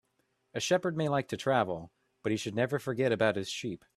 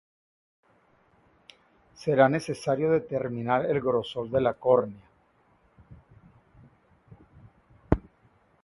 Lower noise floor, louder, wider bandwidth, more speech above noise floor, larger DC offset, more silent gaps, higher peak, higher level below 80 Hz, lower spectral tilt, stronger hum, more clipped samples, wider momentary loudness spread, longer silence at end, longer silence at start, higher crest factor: first, -76 dBFS vs -65 dBFS; second, -31 LUFS vs -26 LUFS; first, 14 kHz vs 11.5 kHz; first, 45 dB vs 39 dB; neither; neither; second, -12 dBFS vs -2 dBFS; second, -68 dBFS vs -48 dBFS; second, -5 dB/octave vs -7 dB/octave; neither; neither; about the same, 9 LU vs 8 LU; second, 0.2 s vs 0.65 s; second, 0.55 s vs 2 s; second, 20 dB vs 26 dB